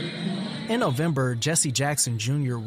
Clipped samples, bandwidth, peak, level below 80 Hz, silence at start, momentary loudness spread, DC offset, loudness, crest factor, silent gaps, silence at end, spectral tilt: under 0.1%; 16 kHz; -8 dBFS; -60 dBFS; 0 s; 8 LU; under 0.1%; -25 LUFS; 16 dB; none; 0 s; -4 dB/octave